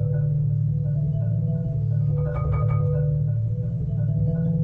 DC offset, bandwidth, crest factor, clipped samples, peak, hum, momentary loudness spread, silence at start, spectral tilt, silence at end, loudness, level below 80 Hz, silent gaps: under 0.1%; 2.4 kHz; 10 dB; under 0.1%; -14 dBFS; none; 3 LU; 0 s; -13 dB/octave; 0 s; -24 LUFS; -36 dBFS; none